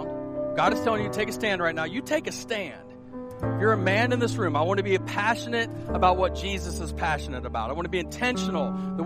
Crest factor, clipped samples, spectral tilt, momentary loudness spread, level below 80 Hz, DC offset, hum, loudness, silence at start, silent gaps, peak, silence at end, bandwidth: 18 dB; under 0.1%; -5.5 dB/octave; 9 LU; -42 dBFS; under 0.1%; none; -26 LUFS; 0 s; none; -8 dBFS; 0 s; 15.5 kHz